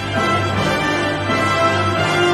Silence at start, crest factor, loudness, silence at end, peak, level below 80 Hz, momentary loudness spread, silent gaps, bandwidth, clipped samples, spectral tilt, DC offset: 0 s; 12 dB; -17 LUFS; 0 s; -4 dBFS; -42 dBFS; 3 LU; none; 13 kHz; under 0.1%; -5 dB/octave; under 0.1%